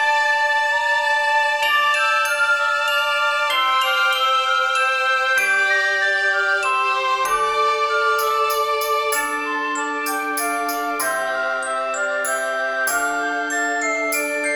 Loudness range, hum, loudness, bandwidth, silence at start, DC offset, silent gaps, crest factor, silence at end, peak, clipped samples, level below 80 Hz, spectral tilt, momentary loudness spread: 4 LU; none; -18 LUFS; 19 kHz; 0 s; under 0.1%; none; 12 dB; 0 s; -8 dBFS; under 0.1%; -60 dBFS; 0.5 dB/octave; 5 LU